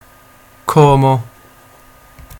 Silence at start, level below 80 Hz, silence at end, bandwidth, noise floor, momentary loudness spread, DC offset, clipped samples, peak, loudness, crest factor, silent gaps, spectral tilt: 0.65 s; -40 dBFS; 1.15 s; 17.5 kHz; -45 dBFS; 17 LU; under 0.1%; 0.1%; 0 dBFS; -12 LUFS; 16 dB; none; -7.5 dB/octave